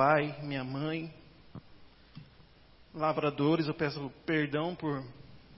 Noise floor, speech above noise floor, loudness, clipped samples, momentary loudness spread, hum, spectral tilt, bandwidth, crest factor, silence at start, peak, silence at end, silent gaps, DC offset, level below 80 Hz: -59 dBFS; 27 dB; -33 LUFS; under 0.1%; 23 LU; none; -10 dB/octave; 5.8 kHz; 22 dB; 0 s; -12 dBFS; 0 s; none; under 0.1%; -64 dBFS